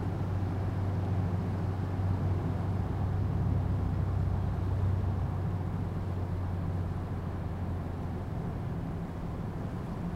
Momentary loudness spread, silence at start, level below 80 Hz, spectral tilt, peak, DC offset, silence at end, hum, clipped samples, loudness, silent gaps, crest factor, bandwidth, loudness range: 6 LU; 0 s; -42 dBFS; -9 dB/octave; -20 dBFS; under 0.1%; 0 s; none; under 0.1%; -33 LUFS; none; 12 dB; 5.8 kHz; 4 LU